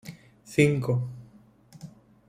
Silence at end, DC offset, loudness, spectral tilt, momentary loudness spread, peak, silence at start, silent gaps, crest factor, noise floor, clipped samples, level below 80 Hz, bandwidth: 0.4 s; under 0.1%; -26 LUFS; -6.5 dB/octave; 25 LU; -8 dBFS; 0.05 s; none; 22 dB; -55 dBFS; under 0.1%; -60 dBFS; 15.5 kHz